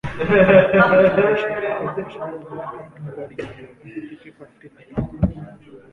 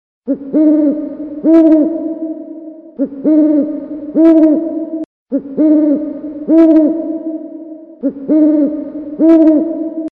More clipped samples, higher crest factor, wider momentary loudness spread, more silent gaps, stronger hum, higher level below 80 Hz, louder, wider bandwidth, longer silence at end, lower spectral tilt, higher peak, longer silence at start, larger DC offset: neither; first, 20 dB vs 12 dB; first, 23 LU vs 16 LU; second, none vs 5.05-5.26 s; neither; first, -40 dBFS vs -54 dBFS; second, -17 LUFS vs -12 LUFS; first, 6 kHz vs 2.8 kHz; first, 0.15 s vs 0 s; about the same, -8.5 dB/octave vs -9.5 dB/octave; about the same, 0 dBFS vs 0 dBFS; second, 0.05 s vs 0.25 s; neither